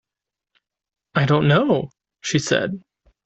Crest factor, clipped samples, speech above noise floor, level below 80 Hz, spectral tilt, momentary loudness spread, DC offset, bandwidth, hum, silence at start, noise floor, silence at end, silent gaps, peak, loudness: 18 dB; under 0.1%; 68 dB; -56 dBFS; -5.5 dB/octave; 15 LU; under 0.1%; 8.2 kHz; none; 1.15 s; -86 dBFS; 0.45 s; none; -4 dBFS; -20 LUFS